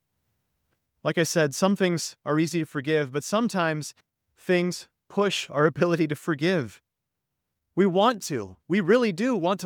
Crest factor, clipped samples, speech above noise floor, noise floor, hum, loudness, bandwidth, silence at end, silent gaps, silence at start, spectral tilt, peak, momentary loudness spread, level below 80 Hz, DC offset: 20 dB; under 0.1%; 59 dB; -83 dBFS; none; -25 LUFS; 19 kHz; 0 s; none; 1.05 s; -5 dB/octave; -6 dBFS; 11 LU; -70 dBFS; under 0.1%